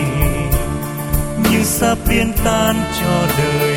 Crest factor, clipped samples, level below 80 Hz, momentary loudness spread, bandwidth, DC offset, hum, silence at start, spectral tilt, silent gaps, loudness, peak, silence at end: 16 dB; under 0.1%; -24 dBFS; 6 LU; 16.5 kHz; under 0.1%; none; 0 s; -5 dB/octave; none; -16 LUFS; 0 dBFS; 0 s